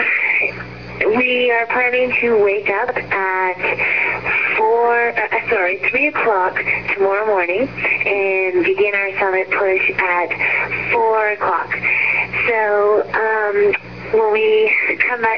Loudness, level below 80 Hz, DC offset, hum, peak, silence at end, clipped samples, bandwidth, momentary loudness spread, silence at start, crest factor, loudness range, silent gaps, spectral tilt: -16 LUFS; -50 dBFS; 0.4%; none; -2 dBFS; 0 s; under 0.1%; 5.4 kHz; 4 LU; 0 s; 14 dB; 1 LU; none; -6.5 dB/octave